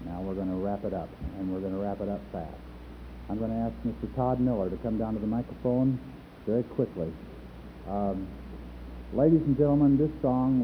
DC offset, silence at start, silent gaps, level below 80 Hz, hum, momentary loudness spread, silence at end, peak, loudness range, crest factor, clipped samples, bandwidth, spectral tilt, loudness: under 0.1%; 0 s; none; -46 dBFS; 60 Hz at -45 dBFS; 20 LU; 0 s; -10 dBFS; 7 LU; 18 dB; under 0.1%; 5.6 kHz; -11 dB/octave; -29 LUFS